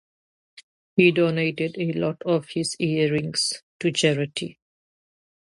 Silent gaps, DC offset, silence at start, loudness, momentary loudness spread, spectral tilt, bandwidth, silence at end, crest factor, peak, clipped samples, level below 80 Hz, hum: 3.63-3.80 s; under 0.1%; 0.95 s; -23 LUFS; 9 LU; -4.5 dB/octave; 11.5 kHz; 0.95 s; 20 dB; -4 dBFS; under 0.1%; -66 dBFS; none